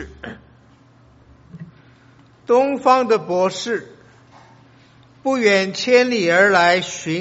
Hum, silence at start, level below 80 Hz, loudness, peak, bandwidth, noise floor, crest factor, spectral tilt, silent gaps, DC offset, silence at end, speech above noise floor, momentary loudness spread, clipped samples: none; 0 s; -54 dBFS; -17 LUFS; 0 dBFS; 8 kHz; -50 dBFS; 20 dB; -2.5 dB/octave; none; under 0.1%; 0 s; 34 dB; 14 LU; under 0.1%